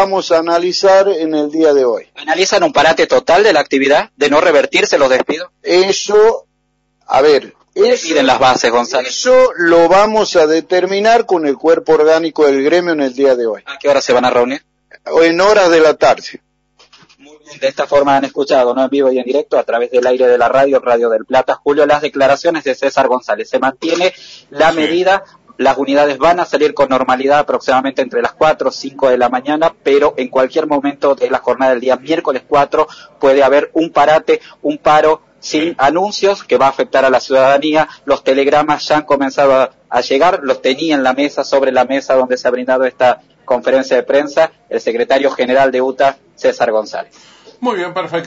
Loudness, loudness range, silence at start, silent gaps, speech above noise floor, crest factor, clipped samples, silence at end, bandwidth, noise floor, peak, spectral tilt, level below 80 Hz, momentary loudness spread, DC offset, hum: -12 LUFS; 3 LU; 0 s; none; 51 dB; 12 dB; under 0.1%; 0 s; 8 kHz; -63 dBFS; 0 dBFS; -2 dB/octave; -50 dBFS; 7 LU; under 0.1%; none